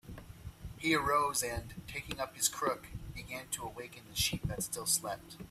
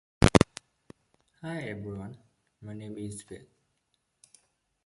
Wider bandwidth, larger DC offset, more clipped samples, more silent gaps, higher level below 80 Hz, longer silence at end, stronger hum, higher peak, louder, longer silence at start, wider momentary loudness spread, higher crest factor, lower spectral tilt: first, 16 kHz vs 11.5 kHz; neither; neither; neither; second, -54 dBFS vs -44 dBFS; second, 0 s vs 1.5 s; neither; second, -12 dBFS vs -2 dBFS; second, -35 LUFS vs -29 LUFS; second, 0.05 s vs 0.2 s; second, 17 LU vs 26 LU; second, 24 dB vs 30 dB; second, -2.5 dB/octave vs -5.5 dB/octave